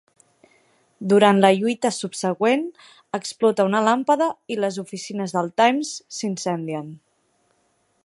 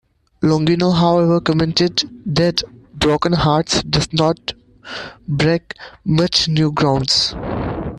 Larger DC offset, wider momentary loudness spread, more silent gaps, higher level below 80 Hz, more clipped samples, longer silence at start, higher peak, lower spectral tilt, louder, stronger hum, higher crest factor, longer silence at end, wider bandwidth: neither; about the same, 14 LU vs 12 LU; neither; second, -74 dBFS vs -38 dBFS; neither; first, 1 s vs 0.4 s; about the same, 0 dBFS vs 0 dBFS; about the same, -5 dB/octave vs -5 dB/octave; second, -21 LUFS vs -17 LUFS; neither; first, 22 dB vs 16 dB; first, 1.1 s vs 0 s; about the same, 11.5 kHz vs 11 kHz